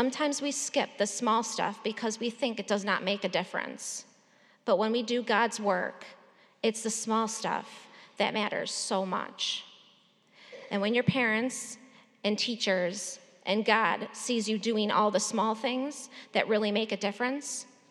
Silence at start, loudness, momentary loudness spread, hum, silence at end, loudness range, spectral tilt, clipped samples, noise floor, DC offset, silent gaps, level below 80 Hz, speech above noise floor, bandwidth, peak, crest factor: 0 s; -30 LUFS; 11 LU; none; 0.25 s; 3 LU; -3 dB/octave; under 0.1%; -63 dBFS; under 0.1%; none; -84 dBFS; 33 dB; 13 kHz; -8 dBFS; 22 dB